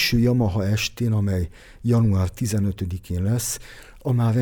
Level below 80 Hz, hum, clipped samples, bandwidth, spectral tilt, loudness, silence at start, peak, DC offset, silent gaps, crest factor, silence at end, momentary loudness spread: -40 dBFS; none; under 0.1%; 19.5 kHz; -5.5 dB/octave; -23 LUFS; 0 s; -8 dBFS; under 0.1%; none; 12 dB; 0 s; 11 LU